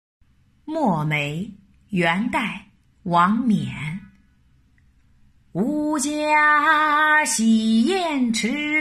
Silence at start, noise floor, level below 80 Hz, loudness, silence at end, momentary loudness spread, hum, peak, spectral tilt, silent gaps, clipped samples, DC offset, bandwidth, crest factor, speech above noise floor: 0.65 s; -58 dBFS; -56 dBFS; -20 LUFS; 0 s; 15 LU; none; -4 dBFS; -4.5 dB/octave; none; under 0.1%; under 0.1%; 13 kHz; 16 dB; 38 dB